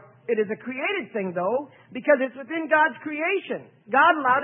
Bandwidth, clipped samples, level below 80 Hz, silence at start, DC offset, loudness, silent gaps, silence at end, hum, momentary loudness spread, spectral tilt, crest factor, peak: 3.8 kHz; under 0.1%; -82 dBFS; 0.3 s; under 0.1%; -24 LUFS; none; 0 s; none; 11 LU; -9 dB/octave; 18 dB; -6 dBFS